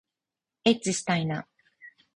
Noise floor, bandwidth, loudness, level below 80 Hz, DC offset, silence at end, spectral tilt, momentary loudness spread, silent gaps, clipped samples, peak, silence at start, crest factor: -89 dBFS; 11 kHz; -27 LUFS; -66 dBFS; under 0.1%; 0.25 s; -4.5 dB/octave; 8 LU; none; under 0.1%; -8 dBFS; 0.65 s; 22 dB